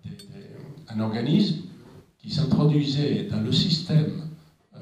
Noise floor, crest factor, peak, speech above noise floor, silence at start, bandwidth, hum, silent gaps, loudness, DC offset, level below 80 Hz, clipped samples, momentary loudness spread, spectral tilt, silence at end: -49 dBFS; 18 dB; -8 dBFS; 26 dB; 0.05 s; 9.4 kHz; none; none; -24 LUFS; under 0.1%; -56 dBFS; under 0.1%; 21 LU; -7 dB/octave; 0 s